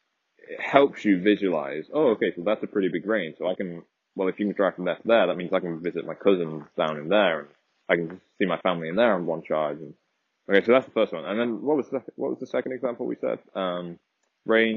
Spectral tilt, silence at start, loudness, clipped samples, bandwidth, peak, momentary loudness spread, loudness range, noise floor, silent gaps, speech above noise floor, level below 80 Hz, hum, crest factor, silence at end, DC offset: -4 dB/octave; 0.5 s; -25 LUFS; under 0.1%; 7 kHz; -4 dBFS; 11 LU; 3 LU; -54 dBFS; none; 29 dB; -74 dBFS; none; 22 dB; 0 s; under 0.1%